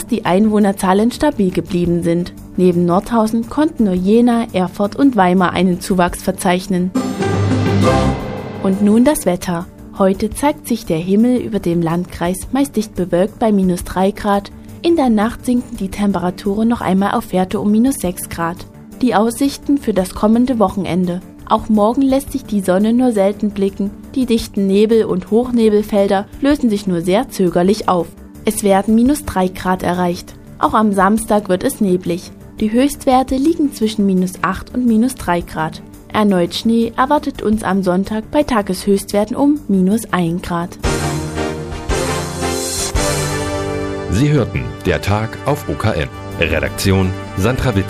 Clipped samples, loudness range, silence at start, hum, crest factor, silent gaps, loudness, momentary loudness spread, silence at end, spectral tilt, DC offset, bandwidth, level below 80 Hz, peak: under 0.1%; 3 LU; 0 s; none; 16 dB; none; -16 LUFS; 7 LU; 0 s; -6 dB/octave; under 0.1%; 15.5 kHz; -34 dBFS; 0 dBFS